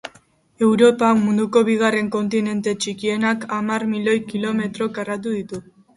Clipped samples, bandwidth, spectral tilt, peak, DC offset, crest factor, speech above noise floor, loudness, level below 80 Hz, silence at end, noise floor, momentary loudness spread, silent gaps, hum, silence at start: under 0.1%; 11.5 kHz; -5.5 dB/octave; -2 dBFS; under 0.1%; 18 dB; 35 dB; -20 LUFS; -62 dBFS; 0.35 s; -54 dBFS; 11 LU; none; none; 0.05 s